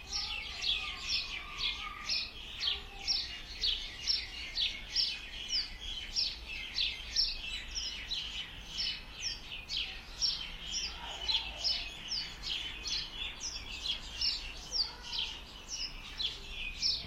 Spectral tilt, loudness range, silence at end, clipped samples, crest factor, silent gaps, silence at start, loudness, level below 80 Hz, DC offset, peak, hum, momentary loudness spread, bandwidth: 0 dB/octave; 3 LU; 0 s; under 0.1%; 18 dB; none; 0 s; -35 LUFS; -50 dBFS; under 0.1%; -20 dBFS; none; 7 LU; 16 kHz